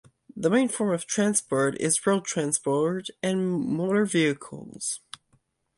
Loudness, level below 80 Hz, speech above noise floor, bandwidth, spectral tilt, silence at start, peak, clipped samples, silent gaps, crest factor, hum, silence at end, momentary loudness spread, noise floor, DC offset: -26 LUFS; -68 dBFS; 43 dB; 11.5 kHz; -4.5 dB/octave; 0.35 s; -8 dBFS; under 0.1%; none; 18 dB; none; 0.8 s; 12 LU; -68 dBFS; under 0.1%